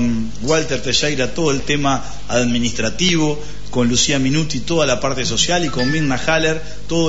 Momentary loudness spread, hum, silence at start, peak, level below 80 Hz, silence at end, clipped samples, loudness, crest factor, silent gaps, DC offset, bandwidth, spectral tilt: 6 LU; 50 Hz at -35 dBFS; 0 s; -2 dBFS; -36 dBFS; 0 s; under 0.1%; -18 LUFS; 14 dB; none; 7%; 8 kHz; -4 dB/octave